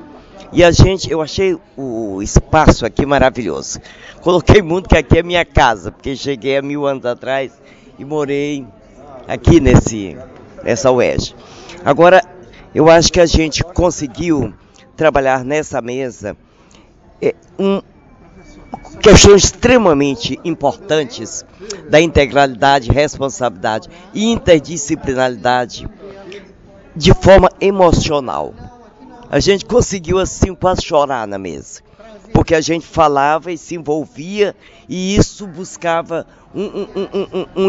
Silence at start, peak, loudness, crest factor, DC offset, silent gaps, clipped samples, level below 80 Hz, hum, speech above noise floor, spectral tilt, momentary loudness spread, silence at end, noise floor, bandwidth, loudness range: 0.15 s; 0 dBFS; -14 LUFS; 14 dB; under 0.1%; none; 0.2%; -26 dBFS; none; 32 dB; -5 dB/octave; 17 LU; 0 s; -45 dBFS; 11 kHz; 8 LU